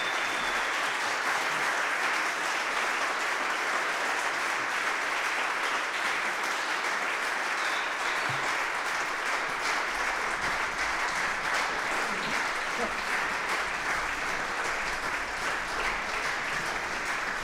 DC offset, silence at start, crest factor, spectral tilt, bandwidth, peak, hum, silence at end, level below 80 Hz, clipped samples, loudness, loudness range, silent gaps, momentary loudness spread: under 0.1%; 0 s; 14 dB; -1 dB/octave; 17 kHz; -14 dBFS; none; 0 s; -54 dBFS; under 0.1%; -28 LUFS; 2 LU; none; 2 LU